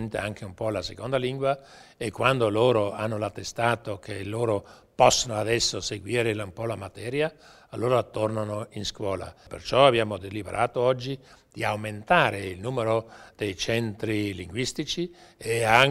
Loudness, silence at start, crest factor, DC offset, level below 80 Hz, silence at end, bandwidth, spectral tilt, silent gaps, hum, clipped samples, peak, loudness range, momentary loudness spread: -26 LUFS; 0 s; 24 dB; under 0.1%; -54 dBFS; 0 s; 16 kHz; -4 dB/octave; none; none; under 0.1%; -4 dBFS; 4 LU; 14 LU